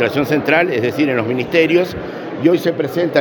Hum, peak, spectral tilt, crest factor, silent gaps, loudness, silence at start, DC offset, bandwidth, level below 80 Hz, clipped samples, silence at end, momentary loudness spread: none; 0 dBFS; -6.5 dB/octave; 16 dB; none; -16 LUFS; 0 s; under 0.1%; 18 kHz; -52 dBFS; under 0.1%; 0 s; 6 LU